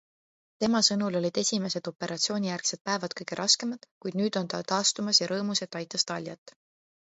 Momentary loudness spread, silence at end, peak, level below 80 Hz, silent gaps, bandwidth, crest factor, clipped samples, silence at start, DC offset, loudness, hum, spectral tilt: 11 LU; 0.55 s; -8 dBFS; -72 dBFS; 2.81-2.85 s, 3.91-4.01 s, 6.38-6.46 s; 8.2 kHz; 22 dB; under 0.1%; 0.6 s; under 0.1%; -27 LUFS; none; -3 dB/octave